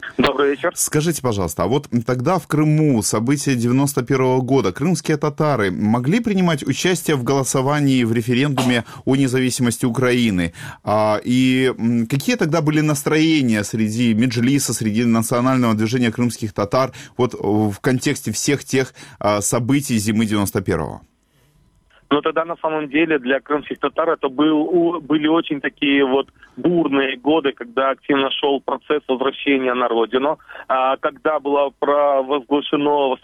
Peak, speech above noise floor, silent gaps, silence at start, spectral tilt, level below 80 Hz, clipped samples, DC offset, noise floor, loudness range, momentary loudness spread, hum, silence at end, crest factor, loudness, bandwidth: -2 dBFS; 40 dB; none; 0 s; -5 dB/octave; -50 dBFS; under 0.1%; under 0.1%; -58 dBFS; 3 LU; 5 LU; none; 0.05 s; 16 dB; -18 LUFS; 16 kHz